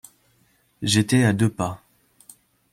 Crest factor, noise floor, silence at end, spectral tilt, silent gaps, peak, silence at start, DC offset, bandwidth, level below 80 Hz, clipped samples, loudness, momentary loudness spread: 20 dB; -63 dBFS; 0.95 s; -5 dB/octave; none; -4 dBFS; 0.8 s; under 0.1%; 16 kHz; -56 dBFS; under 0.1%; -21 LUFS; 12 LU